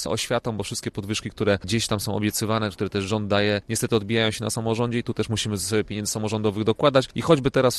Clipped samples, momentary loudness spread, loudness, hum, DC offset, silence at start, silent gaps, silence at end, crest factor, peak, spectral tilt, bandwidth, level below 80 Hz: under 0.1%; 7 LU; -24 LUFS; none; under 0.1%; 0 s; none; 0 s; 20 dB; -4 dBFS; -4.5 dB/octave; 14.5 kHz; -50 dBFS